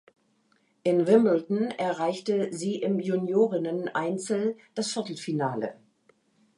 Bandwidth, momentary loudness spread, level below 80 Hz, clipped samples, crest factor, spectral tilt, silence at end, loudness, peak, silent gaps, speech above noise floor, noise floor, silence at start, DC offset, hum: 11.5 kHz; 10 LU; -80 dBFS; under 0.1%; 20 dB; -6 dB/octave; 0.85 s; -27 LUFS; -8 dBFS; none; 42 dB; -68 dBFS; 0.85 s; under 0.1%; none